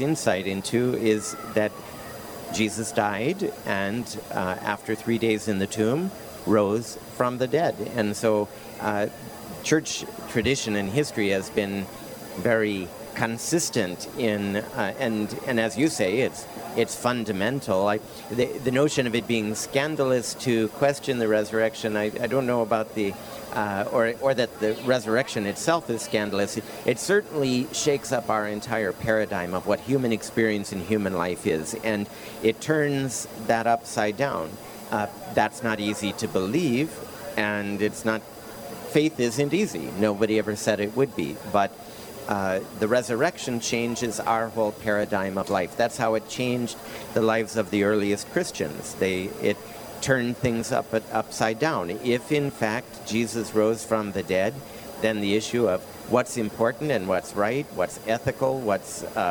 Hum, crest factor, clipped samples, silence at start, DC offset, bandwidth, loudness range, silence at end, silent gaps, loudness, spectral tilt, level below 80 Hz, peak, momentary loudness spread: none; 20 dB; under 0.1%; 0 s; under 0.1%; over 20 kHz; 2 LU; 0 s; none; -26 LUFS; -4.5 dB/octave; -60 dBFS; -6 dBFS; 7 LU